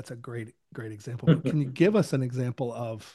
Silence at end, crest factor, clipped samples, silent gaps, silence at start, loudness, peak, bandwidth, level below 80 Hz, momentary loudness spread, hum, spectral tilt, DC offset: 0.05 s; 20 dB; under 0.1%; none; 0 s; -26 LUFS; -8 dBFS; 12.5 kHz; -68 dBFS; 16 LU; none; -7.5 dB/octave; under 0.1%